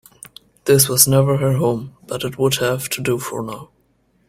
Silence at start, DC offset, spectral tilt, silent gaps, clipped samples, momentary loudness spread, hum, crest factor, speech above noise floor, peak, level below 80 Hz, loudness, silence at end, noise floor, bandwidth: 0.65 s; under 0.1%; -4 dB/octave; none; under 0.1%; 16 LU; none; 20 dB; 43 dB; 0 dBFS; -52 dBFS; -17 LUFS; 0.65 s; -61 dBFS; 16.5 kHz